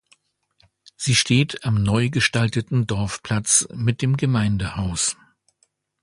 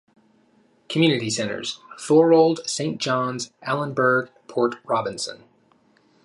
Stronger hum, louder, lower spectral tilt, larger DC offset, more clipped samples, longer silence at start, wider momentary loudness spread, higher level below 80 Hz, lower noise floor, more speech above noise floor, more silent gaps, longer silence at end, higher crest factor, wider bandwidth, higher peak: neither; about the same, -21 LUFS vs -22 LUFS; about the same, -4 dB/octave vs -4.5 dB/octave; neither; neither; about the same, 1 s vs 0.9 s; second, 7 LU vs 14 LU; first, -44 dBFS vs -70 dBFS; first, -67 dBFS vs -60 dBFS; first, 47 dB vs 39 dB; neither; about the same, 0.9 s vs 0.9 s; about the same, 20 dB vs 18 dB; about the same, 11.5 kHz vs 11.5 kHz; about the same, -2 dBFS vs -4 dBFS